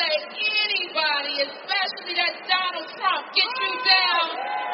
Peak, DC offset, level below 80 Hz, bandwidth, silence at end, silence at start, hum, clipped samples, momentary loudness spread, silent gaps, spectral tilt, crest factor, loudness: -4 dBFS; under 0.1%; -80 dBFS; 6 kHz; 0 s; 0 s; none; under 0.1%; 8 LU; none; 4.5 dB/octave; 20 dB; -22 LUFS